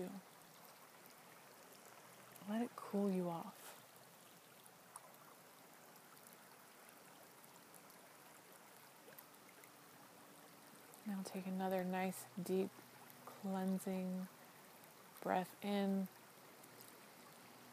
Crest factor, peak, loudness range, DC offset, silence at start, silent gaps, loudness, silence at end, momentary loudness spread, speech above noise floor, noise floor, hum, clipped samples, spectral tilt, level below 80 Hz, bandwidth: 24 dB; -24 dBFS; 16 LU; under 0.1%; 0 s; none; -44 LUFS; 0 s; 19 LU; 22 dB; -63 dBFS; none; under 0.1%; -6 dB/octave; under -90 dBFS; 15.5 kHz